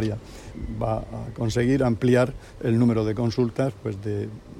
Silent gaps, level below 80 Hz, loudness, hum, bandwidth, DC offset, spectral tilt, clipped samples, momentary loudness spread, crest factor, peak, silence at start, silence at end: none; -42 dBFS; -24 LUFS; none; 11.5 kHz; under 0.1%; -7.5 dB/octave; under 0.1%; 14 LU; 16 dB; -8 dBFS; 0 s; 0 s